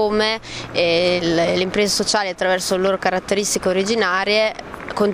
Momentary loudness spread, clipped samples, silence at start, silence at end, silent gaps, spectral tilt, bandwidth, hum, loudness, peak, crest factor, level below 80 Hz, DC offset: 5 LU; under 0.1%; 0 s; 0 s; none; -3 dB/octave; 16 kHz; none; -18 LUFS; -2 dBFS; 16 dB; -48 dBFS; under 0.1%